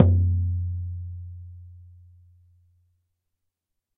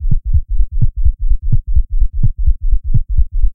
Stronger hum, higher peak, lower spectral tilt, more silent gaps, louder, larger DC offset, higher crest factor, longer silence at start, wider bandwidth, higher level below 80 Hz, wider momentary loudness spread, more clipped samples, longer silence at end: neither; about the same, -2 dBFS vs 0 dBFS; second, -13 dB/octave vs -16 dB/octave; neither; second, -26 LUFS vs -19 LUFS; neither; first, 26 dB vs 10 dB; about the same, 0 s vs 0 s; first, 1.5 kHz vs 0.5 kHz; second, -40 dBFS vs -12 dBFS; first, 25 LU vs 3 LU; second, under 0.1% vs 0.2%; first, 2.1 s vs 0 s